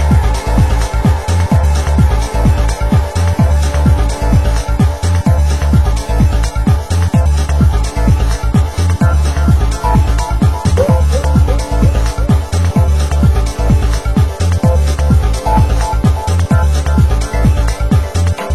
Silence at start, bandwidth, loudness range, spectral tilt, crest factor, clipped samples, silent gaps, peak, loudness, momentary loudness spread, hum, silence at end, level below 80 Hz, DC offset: 0 s; 12.5 kHz; 1 LU; -6.5 dB/octave; 10 dB; under 0.1%; none; 0 dBFS; -13 LUFS; 2 LU; none; 0 s; -12 dBFS; 2%